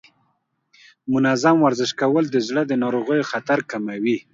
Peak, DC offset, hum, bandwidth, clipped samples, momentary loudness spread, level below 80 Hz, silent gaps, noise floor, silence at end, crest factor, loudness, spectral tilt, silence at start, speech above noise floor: -2 dBFS; under 0.1%; none; 7.8 kHz; under 0.1%; 8 LU; -68 dBFS; none; -69 dBFS; 0.1 s; 18 dB; -20 LUFS; -5.5 dB/octave; 1.05 s; 50 dB